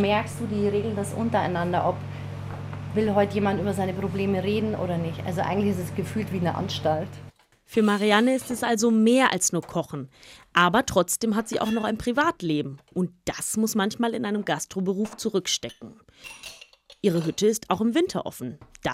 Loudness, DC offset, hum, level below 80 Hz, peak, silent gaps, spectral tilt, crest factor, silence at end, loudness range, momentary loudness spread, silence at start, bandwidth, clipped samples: -25 LUFS; under 0.1%; none; -56 dBFS; -6 dBFS; none; -4.5 dB/octave; 20 dB; 0 s; 5 LU; 15 LU; 0 s; 16 kHz; under 0.1%